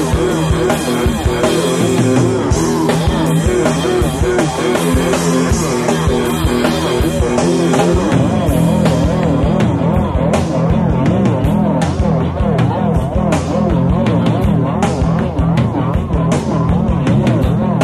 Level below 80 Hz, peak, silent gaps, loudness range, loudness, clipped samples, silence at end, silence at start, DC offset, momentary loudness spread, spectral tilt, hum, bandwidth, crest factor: -24 dBFS; 0 dBFS; none; 1 LU; -14 LUFS; under 0.1%; 0 s; 0 s; under 0.1%; 2 LU; -6.5 dB/octave; none; 14 kHz; 14 dB